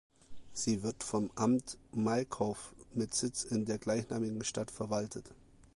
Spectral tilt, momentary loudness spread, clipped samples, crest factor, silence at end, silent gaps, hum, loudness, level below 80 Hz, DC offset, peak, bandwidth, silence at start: -4.5 dB/octave; 9 LU; under 0.1%; 18 dB; 0.4 s; none; none; -36 LUFS; -62 dBFS; under 0.1%; -18 dBFS; 11.5 kHz; 0.3 s